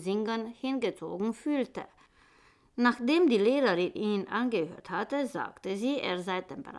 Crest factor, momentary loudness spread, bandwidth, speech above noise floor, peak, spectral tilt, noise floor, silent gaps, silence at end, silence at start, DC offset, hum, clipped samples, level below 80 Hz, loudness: 18 dB; 11 LU; 12 kHz; 33 dB; -12 dBFS; -5.5 dB/octave; -63 dBFS; none; 0 s; 0 s; under 0.1%; none; under 0.1%; -72 dBFS; -30 LUFS